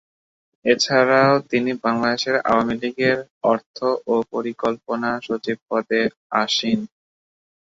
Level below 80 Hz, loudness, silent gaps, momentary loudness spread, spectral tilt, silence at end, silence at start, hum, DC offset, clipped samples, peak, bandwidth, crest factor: -62 dBFS; -20 LUFS; 3.30-3.41 s, 3.66-3.74 s, 5.62-5.66 s, 6.17-6.30 s; 9 LU; -4.5 dB/octave; 0.8 s; 0.65 s; none; under 0.1%; under 0.1%; -2 dBFS; 7.8 kHz; 18 dB